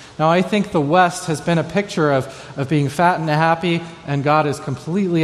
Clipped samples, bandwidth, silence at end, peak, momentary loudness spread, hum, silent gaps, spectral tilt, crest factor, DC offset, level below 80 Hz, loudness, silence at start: under 0.1%; 13 kHz; 0 s; -2 dBFS; 8 LU; none; none; -6 dB/octave; 16 dB; under 0.1%; -54 dBFS; -18 LUFS; 0 s